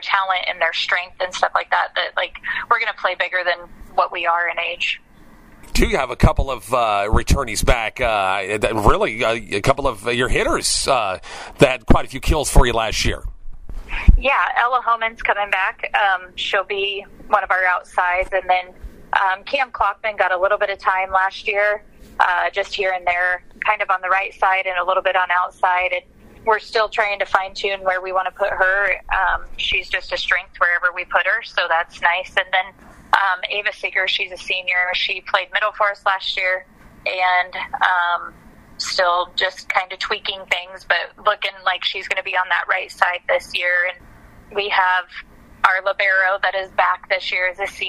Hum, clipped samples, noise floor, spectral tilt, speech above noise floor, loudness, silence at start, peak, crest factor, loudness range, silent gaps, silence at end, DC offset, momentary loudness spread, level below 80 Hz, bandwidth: none; under 0.1%; -45 dBFS; -3.5 dB/octave; 26 dB; -19 LUFS; 0 s; 0 dBFS; 20 dB; 2 LU; none; 0 s; under 0.1%; 6 LU; -30 dBFS; 15.5 kHz